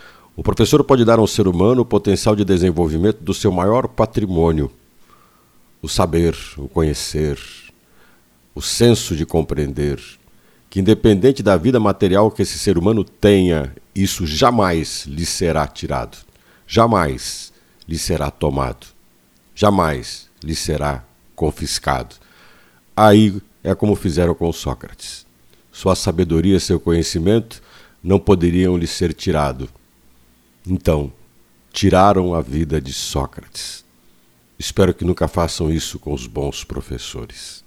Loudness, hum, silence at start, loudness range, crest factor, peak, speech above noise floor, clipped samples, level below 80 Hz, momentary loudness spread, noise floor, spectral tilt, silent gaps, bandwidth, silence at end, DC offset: -17 LUFS; none; 0.35 s; 6 LU; 18 dB; 0 dBFS; 37 dB; under 0.1%; -34 dBFS; 15 LU; -54 dBFS; -5.5 dB/octave; none; 16.5 kHz; 0.1 s; under 0.1%